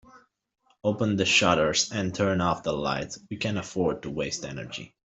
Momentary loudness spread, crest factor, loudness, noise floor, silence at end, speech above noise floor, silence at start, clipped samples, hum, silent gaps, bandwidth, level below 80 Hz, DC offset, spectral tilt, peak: 14 LU; 22 dB; -26 LUFS; -57 dBFS; 0.25 s; 30 dB; 0.15 s; under 0.1%; none; none; 8.2 kHz; -56 dBFS; under 0.1%; -4 dB/octave; -6 dBFS